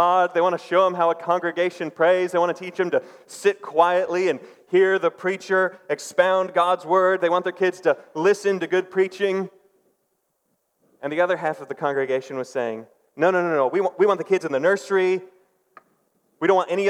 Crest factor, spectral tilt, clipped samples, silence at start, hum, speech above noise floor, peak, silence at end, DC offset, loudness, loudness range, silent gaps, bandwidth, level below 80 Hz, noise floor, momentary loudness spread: 18 dB; -5 dB/octave; under 0.1%; 0 s; none; 51 dB; -4 dBFS; 0 s; under 0.1%; -22 LUFS; 6 LU; none; 12.5 kHz; -86 dBFS; -72 dBFS; 8 LU